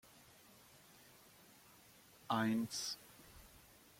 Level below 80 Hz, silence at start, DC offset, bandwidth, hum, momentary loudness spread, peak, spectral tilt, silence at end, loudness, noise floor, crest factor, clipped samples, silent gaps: -74 dBFS; 2.3 s; under 0.1%; 16.5 kHz; none; 25 LU; -24 dBFS; -4 dB/octave; 0.45 s; -40 LUFS; -65 dBFS; 22 dB; under 0.1%; none